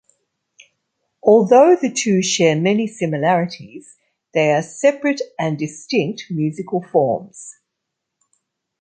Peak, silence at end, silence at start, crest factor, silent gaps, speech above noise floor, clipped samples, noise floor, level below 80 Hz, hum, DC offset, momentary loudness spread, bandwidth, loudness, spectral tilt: -2 dBFS; 1.3 s; 1.25 s; 16 dB; none; 62 dB; under 0.1%; -79 dBFS; -66 dBFS; none; under 0.1%; 14 LU; 9.4 kHz; -17 LUFS; -5 dB/octave